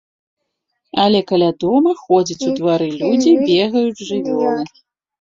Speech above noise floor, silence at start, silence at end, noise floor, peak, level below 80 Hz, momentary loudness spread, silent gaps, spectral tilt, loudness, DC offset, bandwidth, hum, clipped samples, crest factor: 58 dB; 0.95 s; 0.55 s; -73 dBFS; -2 dBFS; -58 dBFS; 7 LU; none; -5.5 dB/octave; -16 LUFS; under 0.1%; 7.6 kHz; none; under 0.1%; 14 dB